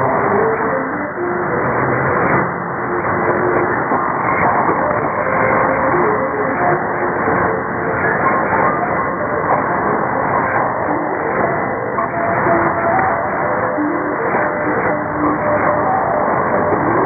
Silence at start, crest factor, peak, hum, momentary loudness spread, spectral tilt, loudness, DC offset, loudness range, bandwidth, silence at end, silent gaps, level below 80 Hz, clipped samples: 0 s; 16 dB; 0 dBFS; none; 4 LU; -16 dB/octave; -16 LUFS; under 0.1%; 1 LU; 2.6 kHz; 0 s; none; -44 dBFS; under 0.1%